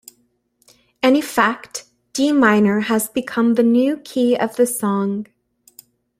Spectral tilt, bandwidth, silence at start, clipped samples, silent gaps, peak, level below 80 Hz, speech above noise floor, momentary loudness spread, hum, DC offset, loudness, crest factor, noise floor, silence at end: -4.5 dB/octave; 16 kHz; 1.05 s; under 0.1%; none; -2 dBFS; -62 dBFS; 47 dB; 15 LU; 60 Hz at -40 dBFS; under 0.1%; -17 LUFS; 18 dB; -64 dBFS; 0.95 s